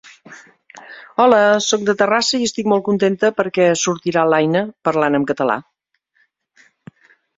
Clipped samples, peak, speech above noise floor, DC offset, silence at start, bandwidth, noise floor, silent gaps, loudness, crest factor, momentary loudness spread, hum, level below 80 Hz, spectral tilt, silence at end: under 0.1%; 0 dBFS; 50 dB; under 0.1%; 0.3 s; 8 kHz; -66 dBFS; none; -16 LUFS; 18 dB; 7 LU; none; -62 dBFS; -4 dB/octave; 1.75 s